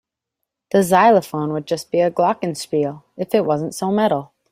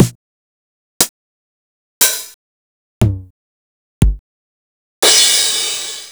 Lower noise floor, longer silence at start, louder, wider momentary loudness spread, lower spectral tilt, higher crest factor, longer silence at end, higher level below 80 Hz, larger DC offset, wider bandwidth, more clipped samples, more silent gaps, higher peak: second, -80 dBFS vs under -90 dBFS; first, 0.75 s vs 0 s; second, -19 LUFS vs -13 LUFS; second, 11 LU vs 15 LU; first, -5.5 dB/octave vs -2 dB/octave; about the same, 18 dB vs 18 dB; first, 0.25 s vs 0 s; second, -62 dBFS vs -28 dBFS; neither; second, 16 kHz vs over 20 kHz; neither; second, none vs 0.15-1.00 s, 1.09-2.01 s, 2.34-3.01 s, 3.30-4.01 s, 4.19-5.02 s; about the same, -2 dBFS vs 0 dBFS